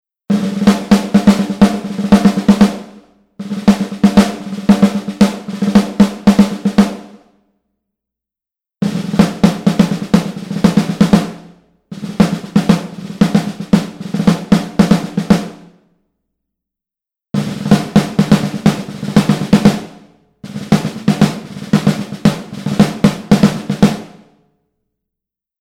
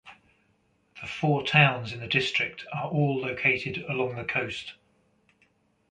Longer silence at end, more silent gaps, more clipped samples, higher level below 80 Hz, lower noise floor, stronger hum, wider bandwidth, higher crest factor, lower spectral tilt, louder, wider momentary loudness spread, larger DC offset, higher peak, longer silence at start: first, 1.55 s vs 1.2 s; neither; first, 0.5% vs under 0.1%; first, -40 dBFS vs -62 dBFS; first, -87 dBFS vs -68 dBFS; neither; first, 14.5 kHz vs 9.4 kHz; second, 14 dB vs 22 dB; about the same, -6.5 dB/octave vs -6 dB/octave; first, -13 LUFS vs -26 LUFS; second, 10 LU vs 14 LU; neither; first, 0 dBFS vs -6 dBFS; first, 0.3 s vs 0.05 s